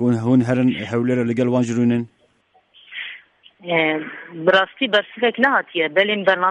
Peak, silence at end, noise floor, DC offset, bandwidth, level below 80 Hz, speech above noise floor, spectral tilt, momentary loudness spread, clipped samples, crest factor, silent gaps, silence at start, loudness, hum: -2 dBFS; 0 s; -60 dBFS; under 0.1%; 9.2 kHz; -62 dBFS; 41 dB; -6.5 dB/octave; 15 LU; under 0.1%; 16 dB; none; 0 s; -18 LUFS; none